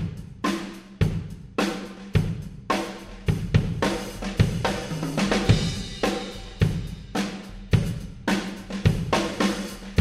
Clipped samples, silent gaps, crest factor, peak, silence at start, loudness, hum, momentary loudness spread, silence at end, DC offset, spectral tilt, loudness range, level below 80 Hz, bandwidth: under 0.1%; none; 20 dB; -4 dBFS; 0 s; -26 LUFS; none; 9 LU; 0 s; under 0.1%; -5.5 dB/octave; 3 LU; -38 dBFS; 15 kHz